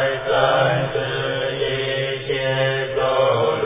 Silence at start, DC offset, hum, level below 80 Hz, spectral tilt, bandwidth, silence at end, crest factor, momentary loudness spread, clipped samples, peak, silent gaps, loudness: 0 s; under 0.1%; none; -48 dBFS; -9 dB/octave; 3.9 kHz; 0 s; 18 dB; 5 LU; under 0.1%; -2 dBFS; none; -20 LUFS